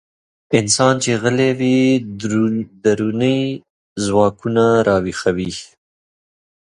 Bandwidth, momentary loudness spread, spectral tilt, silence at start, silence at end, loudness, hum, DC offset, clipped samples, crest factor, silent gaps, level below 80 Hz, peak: 11.5 kHz; 10 LU; -5 dB/octave; 0.5 s; 1 s; -17 LUFS; none; under 0.1%; under 0.1%; 18 dB; 3.70-3.96 s; -48 dBFS; 0 dBFS